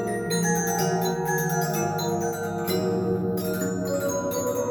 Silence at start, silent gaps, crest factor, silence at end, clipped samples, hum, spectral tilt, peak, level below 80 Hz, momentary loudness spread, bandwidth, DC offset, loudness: 0 s; none; 14 dB; 0 s; under 0.1%; none; -5 dB/octave; -12 dBFS; -56 dBFS; 3 LU; 19 kHz; under 0.1%; -26 LUFS